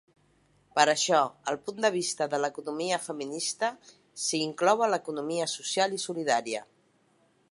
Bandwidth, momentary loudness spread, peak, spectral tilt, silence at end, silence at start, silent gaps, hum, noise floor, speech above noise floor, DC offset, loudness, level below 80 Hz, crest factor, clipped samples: 11.5 kHz; 9 LU; -6 dBFS; -2.5 dB/octave; 0.9 s; 0.75 s; none; none; -67 dBFS; 38 dB; under 0.1%; -28 LUFS; -80 dBFS; 24 dB; under 0.1%